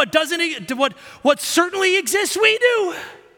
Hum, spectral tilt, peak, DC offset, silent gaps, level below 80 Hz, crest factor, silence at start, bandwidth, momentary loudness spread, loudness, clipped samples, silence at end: none; -1.5 dB/octave; -2 dBFS; under 0.1%; none; -64 dBFS; 18 dB; 0 s; 17.5 kHz; 7 LU; -18 LUFS; under 0.1%; 0.2 s